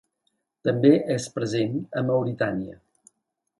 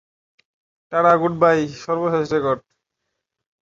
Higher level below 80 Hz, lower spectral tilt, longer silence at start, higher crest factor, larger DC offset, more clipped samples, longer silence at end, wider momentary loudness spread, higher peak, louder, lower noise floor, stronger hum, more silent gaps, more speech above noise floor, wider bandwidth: about the same, -62 dBFS vs -60 dBFS; about the same, -6.5 dB/octave vs -6.5 dB/octave; second, 0.65 s vs 0.9 s; about the same, 22 dB vs 20 dB; neither; neither; second, 0.85 s vs 1.05 s; about the same, 10 LU vs 9 LU; about the same, -4 dBFS vs -2 dBFS; second, -24 LUFS vs -19 LUFS; about the same, -78 dBFS vs -79 dBFS; neither; neither; second, 55 dB vs 60 dB; first, 11.5 kHz vs 7.6 kHz